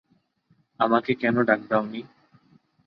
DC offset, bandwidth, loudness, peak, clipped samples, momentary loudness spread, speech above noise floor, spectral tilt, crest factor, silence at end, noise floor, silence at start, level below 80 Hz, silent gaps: under 0.1%; 5.6 kHz; -24 LUFS; -4 dBFS; under 0.1%; 10 LU; 43 dB; -9 dB/octave; 22 dB; 0.85 s; -66 dBFS; 0.8 s; -68 dBFS; none